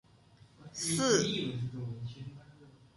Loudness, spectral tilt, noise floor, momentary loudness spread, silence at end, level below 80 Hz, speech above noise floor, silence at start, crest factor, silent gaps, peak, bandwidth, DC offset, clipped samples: -33 LUFS; -4 dB/octave; -61 dBFS; 20 LU; 0.25 s; -66 dBFS; 28 dB; 0.6 s; 22 dB; none; -14 dBFS; 12 kHz; under 0.1%; under 0.1%